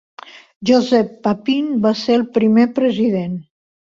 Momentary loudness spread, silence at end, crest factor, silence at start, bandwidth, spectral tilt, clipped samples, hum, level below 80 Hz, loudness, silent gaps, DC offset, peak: 9 LU; 0.55 s; 14 dB; 0.35 s; 7.4 kHz; -6.5 dB/octave; under 0.1%; none; -58 dBFS; -16 LUFS; 0.56-0.61 s; under 0.1%; -2 dBFS